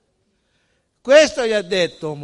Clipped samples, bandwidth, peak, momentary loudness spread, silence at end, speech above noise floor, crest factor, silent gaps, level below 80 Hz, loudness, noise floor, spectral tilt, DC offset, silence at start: under 0.1%; 11.5 kHz; 0 dBFS; 10 LU; 0 s; 50 dB; 18 dB; none; -56 dBFS; -16 LUFS; -67 dBFS; -3 dB/octave; under 0.1%; 1.05 s